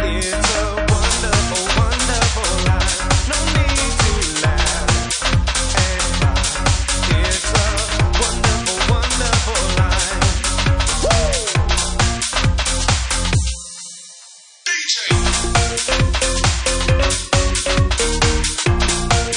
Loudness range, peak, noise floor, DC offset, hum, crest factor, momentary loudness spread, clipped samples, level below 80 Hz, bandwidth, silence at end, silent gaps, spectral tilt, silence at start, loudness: 2 LU; -2 dBFS; -42 dBFS; under 0.1%; none; 16 dB; 2 LU; under 0.1%; -22 dBFS; 10.5 kHz; 0 s; none; -3 dB/octave; 0 s; -17 LUFS